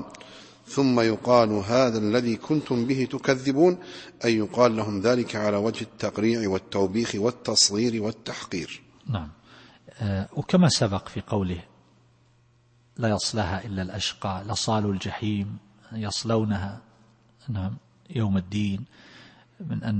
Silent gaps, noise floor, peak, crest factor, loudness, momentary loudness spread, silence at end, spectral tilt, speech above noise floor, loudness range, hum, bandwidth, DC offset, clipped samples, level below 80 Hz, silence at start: none; -61 dBFS; -4 dBFS; 22 dB; -25 LUFS; 15 LU; 0 s; -5 dB/octave; 36 dB; 7 LU; none; 8.8 kHz; under 0.1%; under 0.1%; -56 dBFS; 0 s